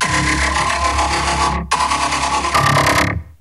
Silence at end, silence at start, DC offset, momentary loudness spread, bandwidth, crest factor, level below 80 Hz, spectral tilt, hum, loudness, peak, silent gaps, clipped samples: 0.1 s; 0 s; 0.1%; 4 LU; 14 kHz; 14 dB; -28 dBFS; -3 dB/octave; none; -16 LUFS; -2 dBFS; none; under 0.1%